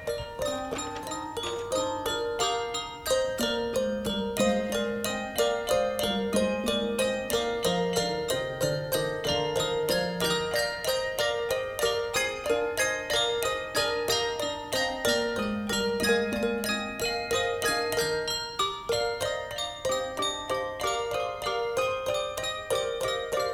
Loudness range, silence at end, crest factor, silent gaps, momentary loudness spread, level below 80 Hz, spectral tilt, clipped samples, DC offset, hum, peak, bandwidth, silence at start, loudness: 2 LU; 0 s; 20 dB; none; 5 LU; -52 dBFS; -3 dB/octave; under 0.1%; under 0.1%; none; -8 dBFS; 19.5 kHz; 0 s; -28 LUFS